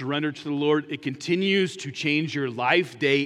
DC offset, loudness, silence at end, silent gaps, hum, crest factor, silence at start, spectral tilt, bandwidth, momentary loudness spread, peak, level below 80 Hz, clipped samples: under 0.1%; -25 LUFS; 0 s; none; none; 18 dB; 0 s; -5 dB/octave; 11.5 kHz; 7 LU; -6 dBFS; -76 dBFS; under 0.1%